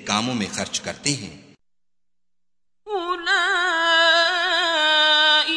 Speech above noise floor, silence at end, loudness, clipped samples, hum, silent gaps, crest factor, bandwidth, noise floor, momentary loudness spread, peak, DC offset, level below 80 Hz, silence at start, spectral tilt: 62 dB; 0 s; -18 LUFS; under 0.1%; none; none; 18 dB; 11 kHz; -88 dBFS; 12 LU; -4 dBFS; under 0.1%; -60 dBFS; 0 s; -1.5 dB/octave